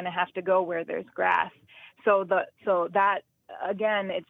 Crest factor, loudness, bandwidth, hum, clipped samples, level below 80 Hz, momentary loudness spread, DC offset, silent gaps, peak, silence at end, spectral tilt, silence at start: 20 dB; -27 LUFS; 4 kHz; none; under 0.1%; -76 dBFS; 9 LU; under 0.1%; none; -8 dBFS; 0.05 s; -7 dB/octave; 0 s